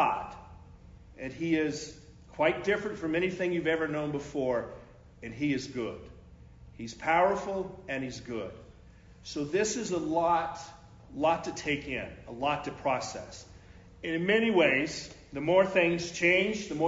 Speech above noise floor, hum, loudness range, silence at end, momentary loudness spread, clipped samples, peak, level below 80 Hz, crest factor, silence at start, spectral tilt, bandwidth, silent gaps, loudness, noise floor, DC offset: 24 dB; none; 5 LU; 0 s; 19 LU; under 0.1%; -12 dBFS; -58 dBFS; 20 dB; 0 s; -4.5 dB/octave; 7.8 kHz; none; -30 LUFS; -54 dBFS; under 0.1%